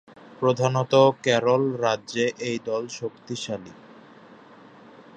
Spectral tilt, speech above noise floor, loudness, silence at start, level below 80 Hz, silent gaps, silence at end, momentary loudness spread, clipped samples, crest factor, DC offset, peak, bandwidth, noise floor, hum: -5 dB/octave; 26 dB; -24 LUFS; 0.4 s; -68 dBFS; none; 0.15 s; 15 LU; under 0.1%; 22 dB; under 0.1%; -4 dBFS; 8.8 kHz; -49 dBFS; none